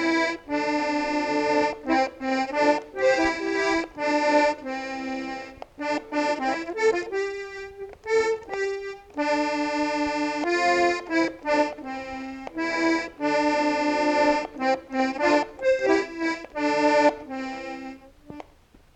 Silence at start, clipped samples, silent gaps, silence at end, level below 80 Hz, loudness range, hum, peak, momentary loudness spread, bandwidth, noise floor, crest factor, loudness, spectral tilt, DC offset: 0 s; under 0.1%; none; 0.55 s; -56 dBFS; 4 LU; none; -10 dBFS; 13 LU; 9.4 kHz; -55 dBFS; 16 dB; -25 LUFS; -3.5 dB/octave; under 0.1%